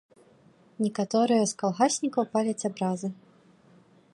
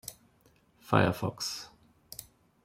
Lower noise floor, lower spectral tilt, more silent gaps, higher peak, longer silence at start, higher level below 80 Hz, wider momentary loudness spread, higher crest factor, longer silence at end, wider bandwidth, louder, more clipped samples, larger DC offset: second, -59 dBFS vs -66 dBFS; about the same, -5 dB/octave vs -5 dB/octave; neither; about the same, -10 dBFS vs -8 dBFS; first, 0.8 s vs 0.05 s; second, -76 dBFS vs -64 dBFS; second, 7 LU vs 20 LU; second, 18 dB vs 26 dB; first, 1 s vs 0.4 s; second, 11.5 kHz vs 16.5 kHz; first, -27 LUFS vs -30 LUFS; neither; neither